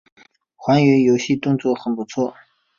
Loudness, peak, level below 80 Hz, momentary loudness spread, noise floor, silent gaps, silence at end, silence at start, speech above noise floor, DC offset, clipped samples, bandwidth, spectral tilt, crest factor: -19 LUFS; -2 dBFS; -60 dBFS; 11 LU; -43 dBFS; none; 0.45 s; 0.6 s; 25 dB; under 0.1%; under 0.1%; 7.4 kHz; -6.5 dB/octave; 16 dB